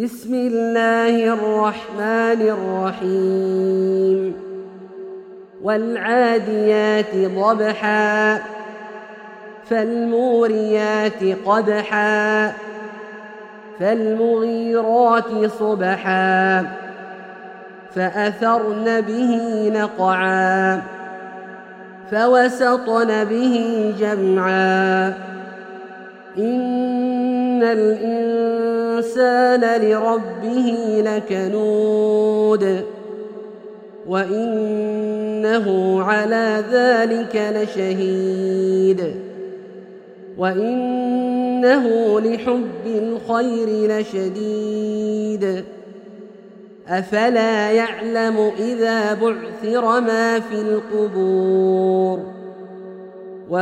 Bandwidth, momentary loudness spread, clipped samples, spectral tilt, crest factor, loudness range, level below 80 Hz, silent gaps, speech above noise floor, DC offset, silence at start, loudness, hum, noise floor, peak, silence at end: 10 kHz; 19 LU; under 0.1%; -6 dB/octave; 16 dB; 4 LU; -66 dBFS; none; 24 dB; under 0.1%; 0 s; -18 LUFS; none; -41 dBFS; -2 dBFS; 0 s